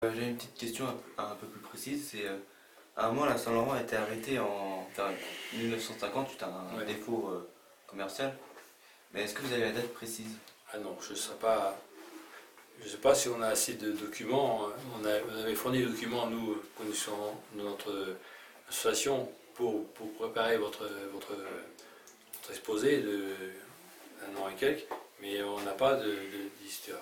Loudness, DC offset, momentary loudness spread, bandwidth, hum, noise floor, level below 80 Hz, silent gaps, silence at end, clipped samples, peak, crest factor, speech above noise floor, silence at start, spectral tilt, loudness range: -35 LUFS; under 0.1%; 17 LU; 19 kHz; none; -59 dBFS; -70 dBFS; none; 0 s; under 0.1%; -12 dBFS; 22 dB; 25 dB; 0 s; -3.5 dB/octave; 5 LU